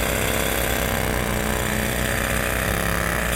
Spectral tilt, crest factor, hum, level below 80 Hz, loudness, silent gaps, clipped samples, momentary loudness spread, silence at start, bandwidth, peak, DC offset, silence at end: -3.5 dB/octave; 16 dB; none; -30 dBFS; -22 LUFS; none; under 0.1%; 1 LU; 0 s; 17 kHz; -6 dBFS; under 0.1%; 0 s